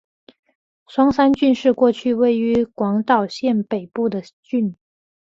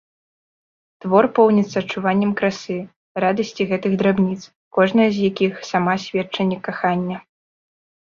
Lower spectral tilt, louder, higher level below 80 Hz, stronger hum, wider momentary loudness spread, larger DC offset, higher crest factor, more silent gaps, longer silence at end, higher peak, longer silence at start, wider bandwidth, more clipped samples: about the same, -7 dB/octave vs -6.5 dB/octave; about the same, -19 LUFS vs -19 LUFS; first, -54 dBFS vs -60 dBFS; neither; about the same, 10 LU vs 12 LU; neither; about the same, 18 dB vs 18 dB; second, 4.33-4.43 s vs 2.96-3.15 s, 4.56-4.71 s; second, 0.6 s vs 0.9 s; about the same, -2 dBFS vs -2 dBFS; second, 0.9 s vs 1.05 s; about the same, 7.6 kHz vs 7.2 kHz; neither